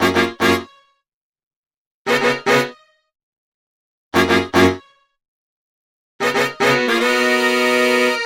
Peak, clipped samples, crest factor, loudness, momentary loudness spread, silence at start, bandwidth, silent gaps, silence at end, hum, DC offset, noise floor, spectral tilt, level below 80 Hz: -2 dBFS; under 0.1%; 18 dB; -16 LUFS; 7 LU; 0 s; 16.5 kHz; 1.13-1.33 s, 1.43-1.63 s, 1.77-2.05 s, 3.23-4.11 s, 5.28-6.19 s; 0 s; none; under 0.1%; -41 dBFS; -4 dB/octave; -54 dBFS